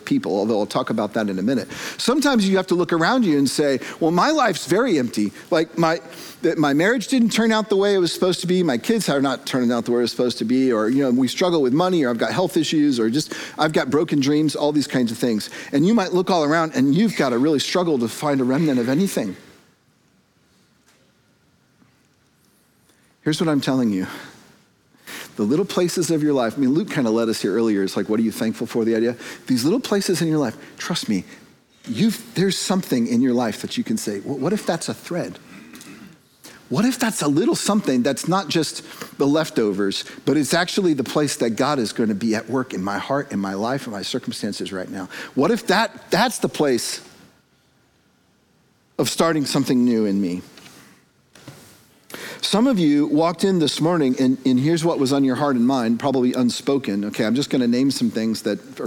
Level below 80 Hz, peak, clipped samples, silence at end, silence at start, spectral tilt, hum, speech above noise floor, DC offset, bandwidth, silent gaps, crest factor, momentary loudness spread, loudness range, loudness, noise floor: -64 dBFS; -2 dBFS; under 0.1%; 0 s; 0 s; -5 dB/octave; none; 40 dB; under 0.1%; 19 kHz; none; 18 dB; 8 LU; 6 LU; -20 LUFS; -60 dBFS